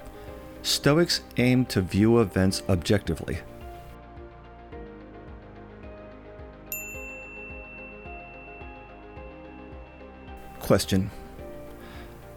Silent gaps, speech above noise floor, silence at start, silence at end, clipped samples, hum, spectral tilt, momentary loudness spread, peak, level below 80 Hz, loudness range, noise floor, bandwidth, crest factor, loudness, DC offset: none; 22 dB; 0 s; 0 s; under 0.1%; none; -5 dB/octave; 23 LU; -6 dBFS; -46 dBFS; 18 LU; -45 dBFS; 19.5 kHz; 22 dB; -25 LUFS; under 0.1%